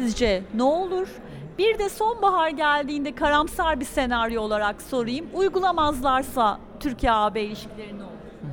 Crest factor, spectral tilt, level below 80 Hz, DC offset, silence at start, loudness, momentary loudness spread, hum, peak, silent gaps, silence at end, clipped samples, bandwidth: 16 dB; -4.5 dB/octave; -42 dBFS; under 0.1%; 0 s; -24 LUFS; 15 LU; none; -8 dBFS; none; 0 s; under 0.1%; over 20 kHz